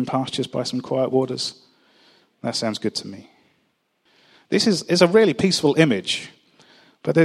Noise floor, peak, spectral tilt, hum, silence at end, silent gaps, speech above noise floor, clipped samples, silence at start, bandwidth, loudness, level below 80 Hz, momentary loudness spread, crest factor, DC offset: -68 dBFS; 0 dBFS; -5 dB/octave; none; 0 s; none; 48 dB; under 0.1%; 0 s; 13.5 kHz; -21 LUFS; -64 dBFS; 13 LU; 22 dB; under 0.1%